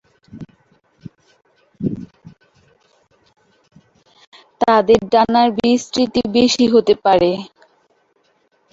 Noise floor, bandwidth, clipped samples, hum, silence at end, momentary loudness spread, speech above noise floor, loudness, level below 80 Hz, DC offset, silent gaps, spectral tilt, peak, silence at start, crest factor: -61 dBFS; 8 kHz; under 0.1%; none; 1.25 s; 20 LU; 47 dB; -15 LUFS; -52 dBFS; under 0.1%; 4.27-4.32 s; -5 dB/octave; 0 dBFS; 0.35 s; 18 dB